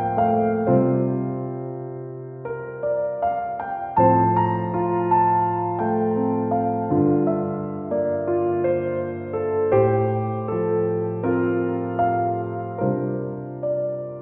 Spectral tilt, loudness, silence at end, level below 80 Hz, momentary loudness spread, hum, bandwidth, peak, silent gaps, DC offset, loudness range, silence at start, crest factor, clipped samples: -13 dB/octave; -22 LUFS; 0 s; -56 dBFS; 10 LU; none; 3.4 kHz; -4 dBFS; none; under 0.1%; 3 LU; 0 s; 18 dB; under 0.1%